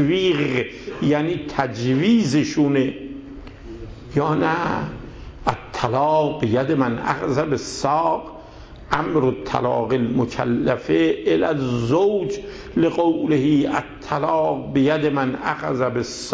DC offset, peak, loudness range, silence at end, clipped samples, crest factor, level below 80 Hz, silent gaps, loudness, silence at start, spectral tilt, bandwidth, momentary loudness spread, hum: under 0.1%; -4 dBFS; 3 LU; 0 s; under 0.1%; 16 dB; -46 dBFS; none; -21 LUFS; 0 s; -6.5 dB/octave; 8 kHz; 10 LU; none